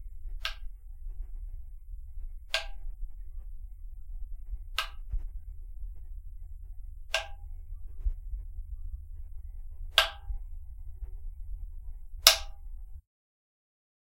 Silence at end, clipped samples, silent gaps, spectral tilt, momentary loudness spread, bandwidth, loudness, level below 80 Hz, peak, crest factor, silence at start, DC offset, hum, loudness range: 1 s; under 0.1%; none; 0.5 dB/octave; 23 LU; 16.5 kHz; -29 LUFS; -40 dBFS; 0 dBFS; 36 dB; 0 s; under 0.1%; none; 13 LU